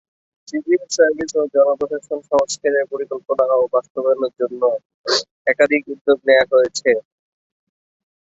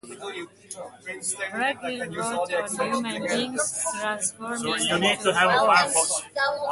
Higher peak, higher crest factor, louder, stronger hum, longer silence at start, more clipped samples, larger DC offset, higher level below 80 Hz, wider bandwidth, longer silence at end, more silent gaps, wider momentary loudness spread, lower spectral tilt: first, -2 dBFS vs -6 dBFS; about the same, 16 dB vs 20 dB; first, -18 LUFS vs -24 LUFS; neither; first, 0.55 s vs 0.05 s; neither; neither; about the same, -62 dBFS vs -66 dBFS; second, 8 kHz vs 12 kHz; first, 1.3 s vs 0 s; first, 3.90-3.95 s, 4.85-5.04 s, 5.31-5.45 s, 6.01-6.05 s vs none; second, 8 LU vs 17 LU; about the same, -2.5 dB/octave vs -2 dB/octave